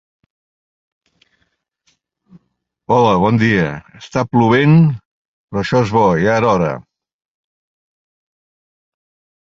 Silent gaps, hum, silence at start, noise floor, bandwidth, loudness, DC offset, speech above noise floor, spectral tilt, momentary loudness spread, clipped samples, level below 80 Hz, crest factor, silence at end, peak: 5.05-5.48 s; none; 2.9 s; -69 dBFS; 7.4 kHz; -14 LUFS; under 0.1%; 56 dB; -7.5 dB/octave; 12 LU; under 0.1%; -46 dBFS; 16 dB; 2.65 s; -2 dBFS